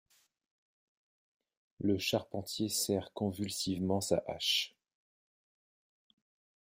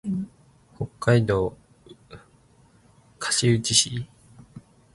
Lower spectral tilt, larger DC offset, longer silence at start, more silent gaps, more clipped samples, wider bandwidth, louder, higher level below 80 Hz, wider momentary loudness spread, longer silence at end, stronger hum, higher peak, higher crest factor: about the same, -4 dB/octave vs -4 dB/octave; neither; first, 1.8 s vs 0.05 s; neither; neither; first, 16 kHz vs 11.5 kHz; second, -34 LUFS vs -23 LUFS; second, -72 dBFS vs -52 dBFS; second, 6 LU vs 17 LU; first, 2 s vs 0.35 s; neither; second, -16 dBFS vs -4 dBFS; about the same, 22 dB vs 22 dB